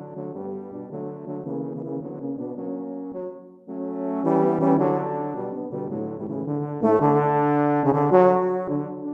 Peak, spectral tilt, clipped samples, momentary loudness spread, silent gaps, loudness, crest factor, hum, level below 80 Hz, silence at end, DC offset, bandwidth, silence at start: -4 dBFS; -10.5 dB/octave; under 0.1%; 15 LU; none; -24 LUFS; 20 dB; none; -66 dBFS; 0 s; under 0.1%; 3.9 kHz; 0 s